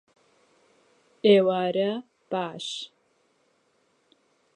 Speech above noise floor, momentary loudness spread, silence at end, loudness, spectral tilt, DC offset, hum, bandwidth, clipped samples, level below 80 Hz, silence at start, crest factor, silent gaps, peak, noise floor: 45 dB; 17 LU; 1.7 s; -25 LUFS; -5.5 dB/octave; under 0.1%; none; 10 kHz; under 0.1%; -84 dBFS; 1.25 s; 22 dB; none; -6 dBFS; -68 dBFS